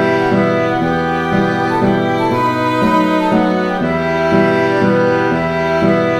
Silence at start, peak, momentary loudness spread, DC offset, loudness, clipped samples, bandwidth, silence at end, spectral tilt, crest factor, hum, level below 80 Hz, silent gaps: 0 s; -2 dBFS; 3 LU; under 0.1%; -14 LUFS; under 0.1%; 14 kHz; 0 s; -7 dB/octave; 12 dB; none; -42 dBFS; none